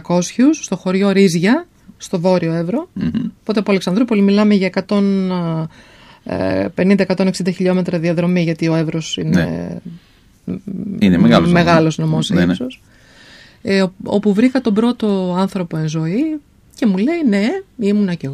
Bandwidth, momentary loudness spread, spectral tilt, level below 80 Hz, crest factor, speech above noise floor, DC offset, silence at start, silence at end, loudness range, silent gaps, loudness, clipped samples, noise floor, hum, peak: 12 kHz; 12 LU; -6.5 dB/octave; -48 dBFS; 16 dB; 28 dB; under 0.1%; 0.1 s; 0 s; 3 LU; none; -16 LUFS; under 0.1%; -43 dBFS; none; 0 dBFS